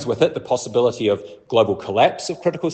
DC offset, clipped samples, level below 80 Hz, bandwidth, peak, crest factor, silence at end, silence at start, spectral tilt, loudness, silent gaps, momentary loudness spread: under 0.1%; under 0.1%; -62 dBFS; 8.8 kHz; -2 dBFS; 18 dB; 0 s; 0 s; -5 dB/octave; -20 LUFS; none; 6 LU